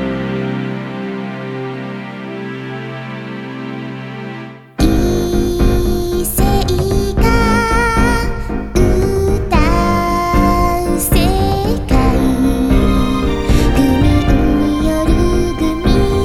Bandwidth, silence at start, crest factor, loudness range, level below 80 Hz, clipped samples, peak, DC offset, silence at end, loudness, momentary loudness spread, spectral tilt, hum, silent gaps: 17 kHz; 0 s; 14 dB; 10 LU; -18 dBFS; under 0.1%; 0 dBFS; under 0.1%; 0 s; -15 LUFS; 13 LU; -6 dB/octave; none; none